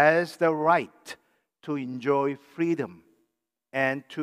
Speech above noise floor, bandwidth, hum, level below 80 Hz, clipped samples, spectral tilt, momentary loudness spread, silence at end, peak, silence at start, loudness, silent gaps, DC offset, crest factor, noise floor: 54 dB; 15 kHz; none; -82 dBFS; under 0.1%; -6.5 dB/octave; 20 LU; 0 s; -6 dBFS; 0 s; -27 LUFS; none; under 0.1%; 20 dB; -80 dBFS